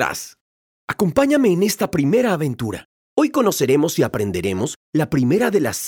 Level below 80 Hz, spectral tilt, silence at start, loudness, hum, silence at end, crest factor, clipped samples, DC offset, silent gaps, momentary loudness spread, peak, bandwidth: -52 dBFS; -5.5 dB/octave; 0 s; -19 LUFS; none; 0 s; 16 dB; under 0.1%; under 0.1%; 0.41-0.88 s, 2.85-3.17 s, 4.76-4.93 s; 12 LU; -2 dBFS; 19.5 kHz